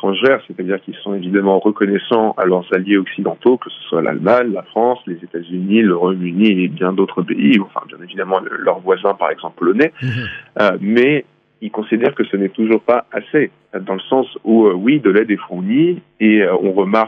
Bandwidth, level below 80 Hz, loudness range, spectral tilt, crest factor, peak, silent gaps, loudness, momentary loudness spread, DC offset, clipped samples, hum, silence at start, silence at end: 5.6 kHz; -64 dBFS; 2 LU; -8.5 dB/octave; 14 dB; 0 dBFS; none; -16 LUFS; 10 LU; under 0.1%; under 0.1%; none; 0 s; 0 s